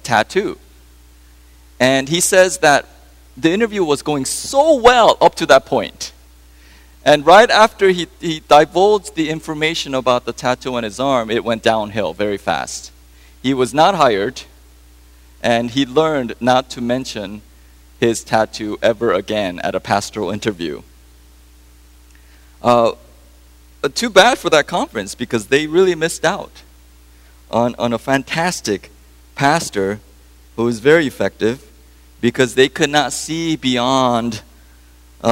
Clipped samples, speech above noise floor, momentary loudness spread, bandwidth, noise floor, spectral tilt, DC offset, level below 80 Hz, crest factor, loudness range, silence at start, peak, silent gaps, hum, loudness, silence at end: under 0.1%; 30 dB; 13 LU; 16 kHz; -45 dBFS; -4 dB/octave; under 0.1%; -44 dBFS; 16 dB; 7 LU; 0.05 s; 0 dBFS; none; 60 Hz at -45 dBFS; -16 LUFS; 0 s